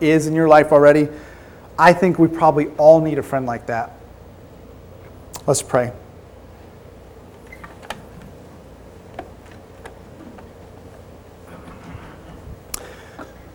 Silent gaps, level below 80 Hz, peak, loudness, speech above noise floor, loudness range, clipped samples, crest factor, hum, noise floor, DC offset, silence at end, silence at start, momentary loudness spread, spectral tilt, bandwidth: none; -48 dBFS; 0 dBFS; -15 LUFS; 27 dB; 26 LU; under 0.1%; 20 dB; none; -42 dBFS; under 0.1%; 0.3 s; 0 s; 28 LU; -6 dB/octave; 18 kHz